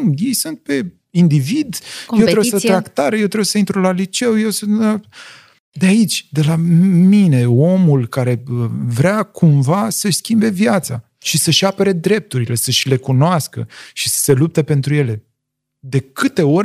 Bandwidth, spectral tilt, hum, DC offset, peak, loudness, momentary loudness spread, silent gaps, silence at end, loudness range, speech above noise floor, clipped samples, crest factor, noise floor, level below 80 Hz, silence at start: 15.5 kHz; -5.5 dB/octave; none; under 0.1%; 0 dBFS; -15 LUFS; 9 LU; 5.60-5.72 s; 0 s; 3 LU; 61 dB; under 0.1%; 14 dB; -76 dBFS; -58 dBFS; 0 s